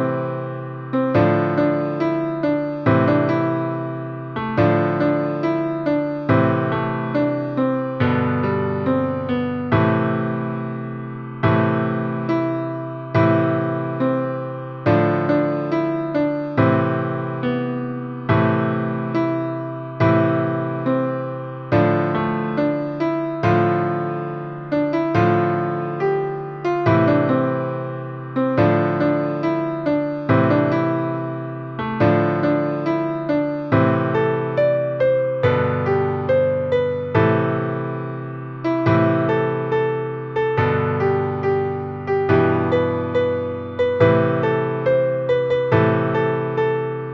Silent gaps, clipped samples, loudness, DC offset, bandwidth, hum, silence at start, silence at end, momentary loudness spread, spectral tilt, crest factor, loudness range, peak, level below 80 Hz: none; under 0.1%; -20 LUFS; under 0.1%; 6.2 kHz; none; 0 s; 0 s; 9 LU; -9.5 dB/octave; 18 dB; 2 LU; -2 dBFS; -52 dBFS